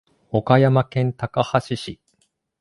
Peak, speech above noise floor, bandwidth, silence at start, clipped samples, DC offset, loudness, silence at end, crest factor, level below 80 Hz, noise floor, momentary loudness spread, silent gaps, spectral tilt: 0 dBFS; 49 dB; 11.5 kHz; 0.35 s; under 0.1%; under 0.1%; -20 LUFS; 0.65 s; 20 dB; -54 dBFS; -68 dBFS; 14 LU; none; -7.5 dB/octave